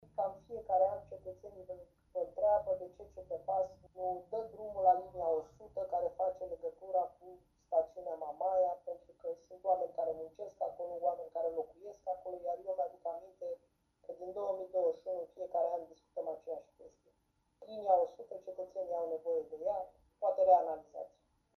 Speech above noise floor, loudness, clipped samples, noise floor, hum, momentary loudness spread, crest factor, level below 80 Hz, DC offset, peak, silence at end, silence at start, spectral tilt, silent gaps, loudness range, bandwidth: 37 dB; -37 LUFS; under 0.1%; -78 dBFS; none; 16 LU; 22 dB; -72 dBFS; under 0.1%; -16 dBFS; 0.5 s; 0.2 s; -7.5 dB/octave; none; 5 LU; 6.4 kHz